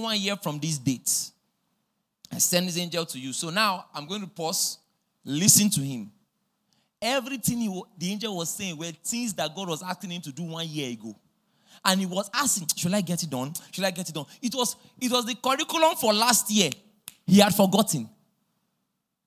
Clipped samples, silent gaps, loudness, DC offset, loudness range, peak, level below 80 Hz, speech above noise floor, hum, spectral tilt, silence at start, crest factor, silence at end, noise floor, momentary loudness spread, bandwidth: under 0.1%; none; -25 LUFS; under 0.1%; 8 LU; -2 dBFS; -66 dBFS; 53 dB; none; -3 dB/octave; 0 s; 26 dB; 1.2 s; -79 dBFS; 15 LU; 16 kHz